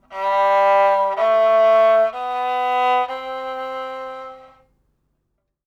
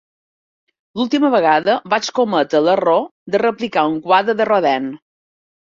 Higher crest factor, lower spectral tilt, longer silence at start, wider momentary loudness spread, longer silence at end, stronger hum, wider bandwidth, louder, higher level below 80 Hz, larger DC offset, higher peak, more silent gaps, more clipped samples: about the same, 12 dB vs 16 dB; second, -3 dB/octave vs -4.5 dB/octave; second, 0.1 s vs 0.95 s; first, 15 LU vs 7 LU; first, 1.25 s vs 0.65 s; first, 50 Hz at -70 dBFS vs none; about the same, 7.6 kHz vs 7.6 kHz; about the same, -18 LUFS vs -16 LUFS; about the same, -64 dBFS vs -64 dBFS; neither; second, -8 dBFS vs -2 dBFS; second, none vs 3.11-3.26 s; neither